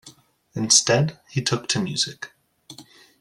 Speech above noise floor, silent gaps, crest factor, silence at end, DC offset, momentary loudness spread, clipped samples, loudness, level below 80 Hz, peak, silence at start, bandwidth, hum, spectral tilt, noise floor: 29 dB; none; 22 dB; 0.4 s; under 0.1%; 21 LU; under 0.1%; -21 LUFS; -60 dBFS; -2 dBFS; 0.05 s; 14 kHz; none; -3 dB/octave; -51 dBFS